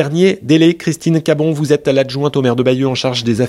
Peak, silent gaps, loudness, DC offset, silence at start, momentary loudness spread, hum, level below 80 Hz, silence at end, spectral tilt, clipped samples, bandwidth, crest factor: 0 dBFS; none; -14 LUFS; under 0.1%; 0 s; 4 LU; none; -54 dBFS; 0 s; -6 dB/octave; under 0.1%; 13 kHz; 14 dB